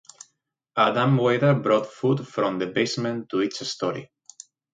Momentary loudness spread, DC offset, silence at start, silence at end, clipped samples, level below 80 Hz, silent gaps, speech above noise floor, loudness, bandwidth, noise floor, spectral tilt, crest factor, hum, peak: 9 LU; under 0.1%; 0.75 s; 0.7 s; under 0.1%; -68 dBFS; none; 49 dB; -23 LUFS; 9.2 kHz; -72 dBFS; -6 dB/octave; 20 dB; none; -4 dBFS